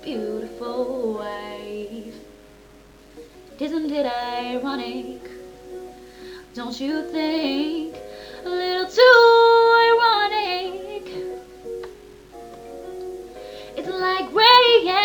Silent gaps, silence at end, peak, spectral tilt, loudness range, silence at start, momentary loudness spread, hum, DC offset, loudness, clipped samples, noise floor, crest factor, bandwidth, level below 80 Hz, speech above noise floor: none; 0 s; -2 dBFS; -3.5 dB/octave; 15 LU; 0 s; 26 LU; none; under 0.1%; -18 LUFS; under 0.1%; -48 dBFS; 20 dB; 18 kHz; -56 dBFS; 28 dB